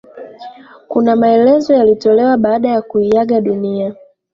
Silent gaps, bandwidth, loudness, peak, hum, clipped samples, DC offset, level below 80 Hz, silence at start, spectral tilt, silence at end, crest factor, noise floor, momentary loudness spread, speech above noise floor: none; 7.2 kHz; -12 LUFS; -2 dBFS; none; under 0.1%; under 0.1%; -54 dBFS; 0.15 s; -7.5 dB/octave; 0.4 s; 12 dB; -35 dBFS; 10 LU; 23 dB